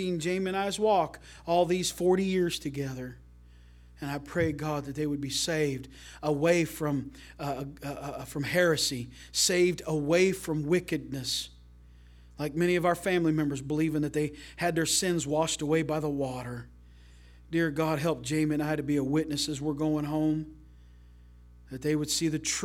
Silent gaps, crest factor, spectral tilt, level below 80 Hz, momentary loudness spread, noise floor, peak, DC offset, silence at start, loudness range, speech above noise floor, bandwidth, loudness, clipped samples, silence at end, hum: none; 18 dB; -4.5 dB/octave; -54 dBFS; 12 LU; -53 dBFS; -12 dBFS; under 0.1%; 0 s; 4 LU; 24 dB; 17 kHz; -29 LUFS; under 0.1%; 0 s; 60 Hz at -50 dBFS